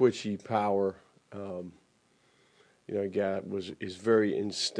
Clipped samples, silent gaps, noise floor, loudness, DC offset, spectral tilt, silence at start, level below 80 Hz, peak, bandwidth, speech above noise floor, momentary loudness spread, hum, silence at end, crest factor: under 0.1%; none; -68 dBFS; -31 LUFS; under 0.1%; -5 dB/octave; 0 s; -76 dBFS; -12 dBFS; 10.5 kHz; 38 dB; 15 LU; none; 0 s; 20 dB